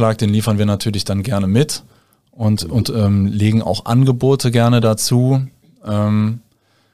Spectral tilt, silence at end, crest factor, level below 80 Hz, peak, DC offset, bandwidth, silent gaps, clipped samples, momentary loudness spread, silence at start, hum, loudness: -6.5 dB/octave; 0.55 s; 14 dB; -46 dBFS; 0 dBFS; 0.8%; 15 kHz; none; under 0.1%; 8 LU; 0 s; none; -16 LUFS